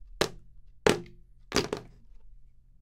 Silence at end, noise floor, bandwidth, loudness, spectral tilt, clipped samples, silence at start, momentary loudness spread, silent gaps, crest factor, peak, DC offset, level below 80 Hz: 0.35 s; -52 dBFS; 16.5 kHz; -31 LUFS; -3.5 dB/octave; under 0.1%; 0.1 s; 11 LU; none; 32 dB; 0 dBFS; under 0.1%; -50 dBFS